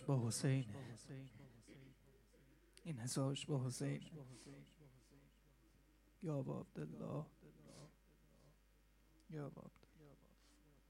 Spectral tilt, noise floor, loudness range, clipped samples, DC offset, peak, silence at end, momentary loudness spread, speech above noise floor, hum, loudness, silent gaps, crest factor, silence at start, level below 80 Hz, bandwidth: -5.5 dB/octave; -72 dBFS; 9 LU; under 0.1%; under 0.1%; -26 dBFS; 0.75 s; 25 LU; 28 dB; none; -46 LUFS; none; 22 dB; 0 s; -74 dBFS; 13.5 kHz